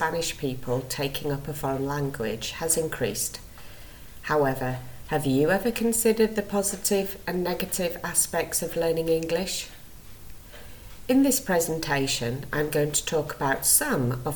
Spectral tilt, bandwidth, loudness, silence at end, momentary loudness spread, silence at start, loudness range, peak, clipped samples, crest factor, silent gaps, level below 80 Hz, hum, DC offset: -3.5 dB/octave; 19.5 kHz; -25 LUFS; 0 s; 16 LU; 0 s; 4 LU; -6 dBFS; under 0.1%; 20 dB; none; -48 dBFS; none; under 0.1%